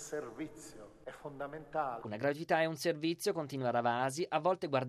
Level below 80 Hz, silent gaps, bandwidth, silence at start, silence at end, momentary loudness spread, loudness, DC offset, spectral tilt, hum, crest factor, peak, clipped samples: -70 dBFS; none; 13.5 kHz; 0 s; 0 s; 16 LU; -36 LUFS; under 0.1%; -5 dB/octave; none; 20 dB; -16 dBFS; under 0.1%